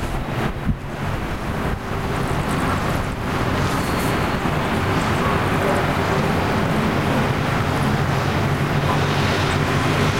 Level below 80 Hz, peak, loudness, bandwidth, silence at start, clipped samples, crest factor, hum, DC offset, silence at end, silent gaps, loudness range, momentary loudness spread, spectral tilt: -32 dBFS; -6 dBFS; -21 LUFS; 16 kHz; 0 s; under 0.1%; 14 dB; none; 0.8%; 0 s; none; 3 LU; 6 LU; -6 dB/octave